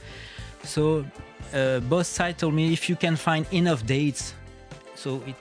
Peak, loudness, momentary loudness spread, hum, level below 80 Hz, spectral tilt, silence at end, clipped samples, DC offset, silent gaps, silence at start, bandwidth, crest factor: -8 dBFS; -25 LUFS; 17 LU; none; -48 dBFS; -5.5 dB/octave; 0 s; under 0.1%; under 0.1%; none; 0 s; 10.5 kHz; 18 dB